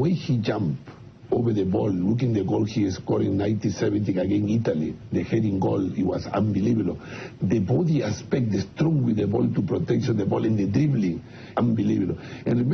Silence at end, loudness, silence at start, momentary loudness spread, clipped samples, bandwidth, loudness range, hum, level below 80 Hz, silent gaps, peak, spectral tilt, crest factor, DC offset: 0 s; -24 LUFS; 0 s; 6 LU; under 0.1%; 6.6 kHz; 1 LU; none; -52 dBFS; none; -10 dBFS; -8 dB/octave; 14 dB; under 0.1%